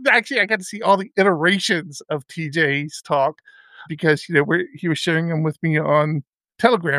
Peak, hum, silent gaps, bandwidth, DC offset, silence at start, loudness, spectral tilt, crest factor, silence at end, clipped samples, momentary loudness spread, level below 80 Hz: -2 dBFS; none; 6.28-6.38 s; 14 kHz; under 0.1%; 0 s; -20 LUFS; -5 dB/octave; 18 dB; 0 s; under 0.1%; 9 LU; -70 dBFS